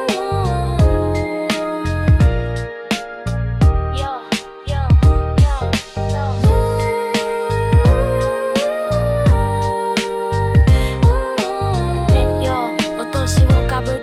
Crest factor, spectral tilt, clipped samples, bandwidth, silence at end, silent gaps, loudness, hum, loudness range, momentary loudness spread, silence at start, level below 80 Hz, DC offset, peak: 14 dB; -6.5 dB/octave; under 0.1%; 13.5 kHz; 0 s; none; -17 LUFS; none; 2 LU; 9 LU; 0 s; -22 dBFS; under 0.1%; -2 dBFS